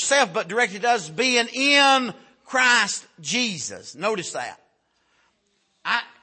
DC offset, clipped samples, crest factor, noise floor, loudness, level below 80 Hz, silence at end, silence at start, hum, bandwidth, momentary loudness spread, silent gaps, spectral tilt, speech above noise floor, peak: under 0.1%; under 0.1%; 20 dB; -69 dBFS; -21 LUFS; -76 dBFS; 0.15 s; 0 s; none; 8.8 kHz; 15 LU; none; -1.5 dB/octave; 47 dB; -4 dBFS